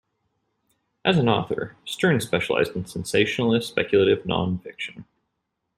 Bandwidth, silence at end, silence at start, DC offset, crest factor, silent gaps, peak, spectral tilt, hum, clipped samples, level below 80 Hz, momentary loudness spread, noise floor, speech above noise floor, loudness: 14.5 kHz; 0.75 s; 1.05 s; under 0.1%; 20 dB; none; -4 dBFS; -5.5 dB/octave; none; under 0.1%; -56 dBFS; 11 LU; -78 dBFS; 56 dB; -23 LUFS